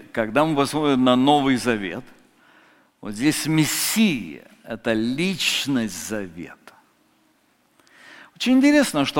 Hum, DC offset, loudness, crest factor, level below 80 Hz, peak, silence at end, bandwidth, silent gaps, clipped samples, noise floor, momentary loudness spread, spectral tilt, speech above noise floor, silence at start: none; under 0.1%; -20 LUFS; 20 dB; -54 dBFS; -2 dBFS; 0 s; 17 kHz; none; under 0.1%; -62 dBFS; 19 LU; -4 dB/octave; 42 dB; 0 s